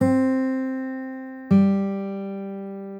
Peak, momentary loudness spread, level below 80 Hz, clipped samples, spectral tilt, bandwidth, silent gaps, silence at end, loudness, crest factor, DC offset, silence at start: -8 dBFS; 15 LU; -64 dBFS; under 0.1%; -9.5 dB/octave; 8.8 kHz; none; 0 s; -24 LUFS; 16 dB; under 0.1%; 0 s